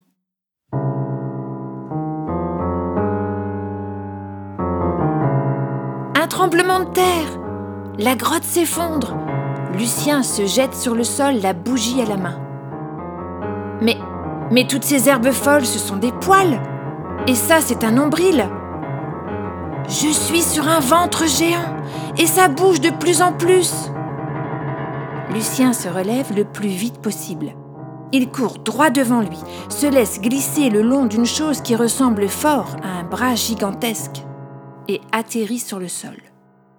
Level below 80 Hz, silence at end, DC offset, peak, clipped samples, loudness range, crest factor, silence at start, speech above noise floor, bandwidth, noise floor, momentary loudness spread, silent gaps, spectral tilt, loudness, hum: -48 dBFS; 0.6 s; under 0.1%; 0 dBFS; under 0.1%; 6 LU; 18 dB; 0.7 s; 63 dB; over 20 kHz; -80 dBFS; 13 LU; none; -4 dB/octave; -18 LUFS; none